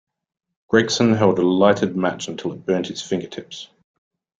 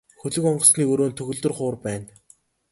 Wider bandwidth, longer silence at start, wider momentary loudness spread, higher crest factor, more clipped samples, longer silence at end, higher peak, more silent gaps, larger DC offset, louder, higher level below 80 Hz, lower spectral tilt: second, 9.2 kHz vs 12 kHz; first, 0.7 s vs 0.25 s; about the same, 16 LU vs 15 LU; about the same, 20 dB vs 22 dB; neither; about the same, 0.75 s vs 0.65 s; about the same, -2 dBFS vs 0 dBFS; neither; neither; about the same, -19 LUFS vs -21 LUFS; about the same, -58 dBFS vs -60 dBFS; about the same, -5 dB/octave vs -4.5 dB/octave